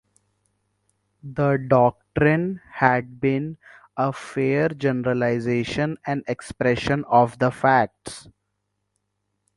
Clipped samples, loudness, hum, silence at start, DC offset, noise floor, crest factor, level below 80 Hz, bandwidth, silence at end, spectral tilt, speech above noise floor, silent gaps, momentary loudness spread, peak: under 0.1%; -22 LUFS; 50 Hz at -60 dBFS; 1.25 s; under 0.1%; -76 dBFS; 22 dB; -52 dBFS; 11.5 kHz; 1.35 s; -7 dB/octave; 55 dB; none; 11 LU; 0 dBFS